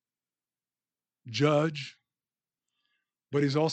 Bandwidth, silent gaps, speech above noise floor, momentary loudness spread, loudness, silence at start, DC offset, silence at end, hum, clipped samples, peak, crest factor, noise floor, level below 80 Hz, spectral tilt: 8.6 kHz; none; over 63 dB; 14 LU; -28 LUFS; 1.25 s; under 0.1%; 0 s; none; under 0.1%; -10 dBFS; 22 dB; under -90 dBFS; -80 dBFS; -6 dB/octave